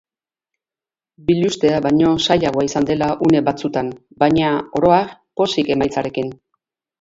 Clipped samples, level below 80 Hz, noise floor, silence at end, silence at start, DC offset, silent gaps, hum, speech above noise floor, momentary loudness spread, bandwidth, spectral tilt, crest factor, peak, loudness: under 0.1%; -48 dBFS; under -90 dBFS; 0.65 s; 1.3 s; under 0.1%; none; none; over 73 dB; 9 LU; 8 kHz; -6 dB/octave; 18 dB; 0 dBFS; -17 LUFS